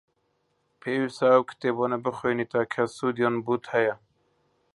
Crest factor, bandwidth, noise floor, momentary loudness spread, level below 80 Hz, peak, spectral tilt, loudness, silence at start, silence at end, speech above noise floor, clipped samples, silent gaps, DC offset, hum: 22 dB; 11.5 kHz; -72 dBFS; 8 LU; -70 dBFS; -6 dBFS; -6.5 dB/octave; -26 LUFS; 0.85 s; 0.8 s; 47 dB; under 0.1%; none; under 0.1%; none